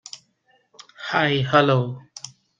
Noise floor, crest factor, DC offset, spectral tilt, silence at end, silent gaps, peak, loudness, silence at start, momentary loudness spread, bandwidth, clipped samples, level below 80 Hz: -64 dBFS; 20 dB; under 0.1%; -5.5 dB/octave; 0.3 s; none; -2 dBFS; -20 LUFS; 0.15 s; 22 LU; 9.2 kHz; under 0.1%; -62 dBFS